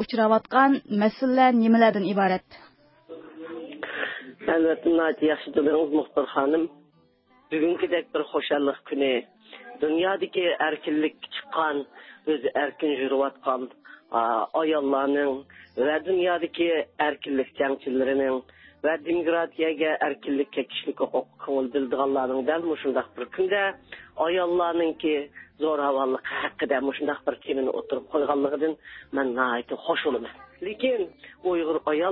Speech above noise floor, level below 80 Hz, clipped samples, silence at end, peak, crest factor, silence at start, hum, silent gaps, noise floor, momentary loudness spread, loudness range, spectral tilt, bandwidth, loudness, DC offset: 37 dB; -66 dBFS; under 0.1%; 0 s; -6 dBFS; 18 dB; 0 s; none; none; -61 dBFS; 10 LU; 3 LU; -9.5 dB/octave; 5.8 kHz; -25 LUFS; under 0.1%